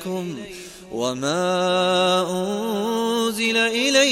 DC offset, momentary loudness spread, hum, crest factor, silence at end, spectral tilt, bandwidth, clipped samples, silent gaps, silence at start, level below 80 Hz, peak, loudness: under 0.1%; 14 LU; none; 14 dB; 0 s; -3.5 dB/octave; 16.5 kHz; under 0.1%; none; 0 s; -60 dBFS; -6 dBFS; -21 LUFS